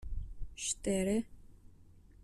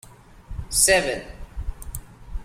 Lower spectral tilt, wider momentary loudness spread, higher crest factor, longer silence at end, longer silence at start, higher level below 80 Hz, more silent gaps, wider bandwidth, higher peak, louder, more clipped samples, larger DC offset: first, -4.5 dB/octave vs -1.5 dB/octave; second, 16 LU vs 23 LU; second, 16 dB vs 22 dB; about the same, 0 s vs 0 s; about the same, 0 s vs 0.05 s; second, -46 dBFS vs -36 dBFS; neither; second, 13.5 kHz vs 16.5 kHz; second, -22 dBFS vs -4 dBFS; second, -36 LUFS vs -19 LUFS; neither; neither